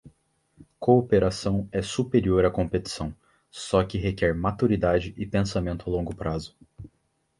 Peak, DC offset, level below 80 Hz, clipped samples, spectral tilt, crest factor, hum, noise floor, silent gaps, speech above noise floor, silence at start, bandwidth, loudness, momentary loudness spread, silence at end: -6 dBFS; under 0.1%; -42 dBFS; under 0.1%; -6.5 dB/octave; 20 dB; none; -71 dBFS; none; 47 dB; 0.05 s; 11.5 kHz; -25 LUFS; 12 LU; 0.5 s